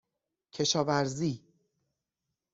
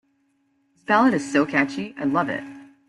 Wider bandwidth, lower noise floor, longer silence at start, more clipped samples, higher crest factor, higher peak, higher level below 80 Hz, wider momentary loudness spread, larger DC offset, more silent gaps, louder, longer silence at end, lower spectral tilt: second, 8 kHz vs 11.5 kHz; first, -87 dBFS vs -67 dBFS; second, 0.55 s vs 0.9 s; neither; about the same, 22 dB vs 18 dB; second, -14 dBFS vs -6 dBFS; about the same, -70 dBFS vs -66 dBFS; about the same, 15 LU vs 14 LU; neither; neither; second, -30 LUFS vs -22 LUFS; first, 1.15 s vs 0.25 s; second, -4 dB/octave vs -5.5 dB/octave